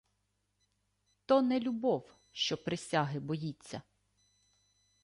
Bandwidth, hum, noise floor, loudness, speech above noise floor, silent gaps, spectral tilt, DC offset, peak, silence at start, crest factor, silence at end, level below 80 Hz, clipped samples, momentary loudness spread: 11.5 kHz; 50 Hz at -75 dBFS; -80 dBFS; -33 LUFS; 47 dB; none; -5.5 dB/octave; under 0.1%; -16 dBFS; 1.3 s; 20 dB; 1.25 s; -72 dBFS; under 0.1%; 18 LU